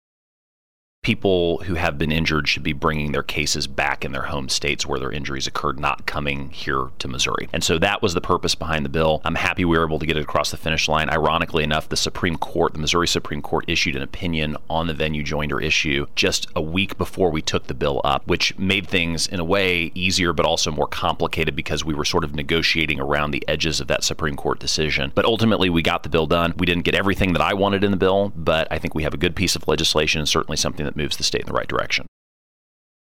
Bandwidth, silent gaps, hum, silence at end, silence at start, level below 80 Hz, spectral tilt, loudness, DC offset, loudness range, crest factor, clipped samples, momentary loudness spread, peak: 17 kHz; none; none; 0.95 s; 1 s; -38 dBFS; -4 dB/octave; -21 LUFS; 3%; 3 LU; 16 dB; under 0.1%; 6 LU; -6 dBFS